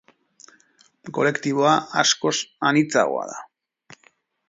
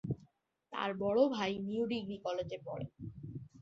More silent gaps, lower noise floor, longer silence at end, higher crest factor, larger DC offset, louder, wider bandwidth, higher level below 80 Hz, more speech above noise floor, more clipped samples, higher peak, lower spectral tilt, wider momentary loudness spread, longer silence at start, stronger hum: neither; second, -61 dBFS vs -69 dBFS; first, 1.05 s vs 0 s; about the same, 20 dB vs 20 dB; neither; first, -21 LUFS vs -37 LUFS; about the same, 7.8 kHz vs 7.6 kHz; second, -72 dBFS vs -66 dBFS; first, 40 dB vs 33 dB; neither; first, -2 dBFS vs -18 dBFS; second, -3.5 dB/octave vs -5 dB/octave; second, 12 LU vs 16 LU; first, 1.05 s vs 0.05 s; neither